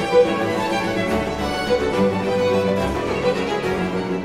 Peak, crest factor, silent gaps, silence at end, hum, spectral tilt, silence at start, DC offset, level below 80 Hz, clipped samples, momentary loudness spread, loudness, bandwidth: -4 dBFS; 16 dB; none; 0 s; none; -5.5 dB/octave; 0 s; under 0.1%; -40 dBFS; under 0.1%; 4 LU; -20 LUFS; 15 kHz